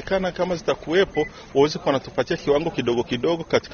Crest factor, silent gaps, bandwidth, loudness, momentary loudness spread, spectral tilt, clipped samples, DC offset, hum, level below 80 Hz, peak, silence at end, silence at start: 18 dB; none; 7 kHz; -23 LUFS; 4 LU; -5.5 dB/octave; under 0.1%; under 0.1%; none; -48 dBFS; -6 dBFS; 0 s; 0 s